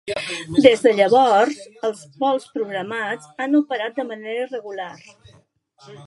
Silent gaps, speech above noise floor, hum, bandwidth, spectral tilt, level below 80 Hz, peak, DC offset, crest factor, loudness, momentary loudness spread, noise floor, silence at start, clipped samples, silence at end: none; 35 dB; none; 11.5 kHz; -4.5 dB/octave; -62 dBFS; 0 dBFS; under 0.1%; 20 dB; -20 LUFS; 14 LU; -55 dBFS; 0.05 s; under 0.1%; 0 s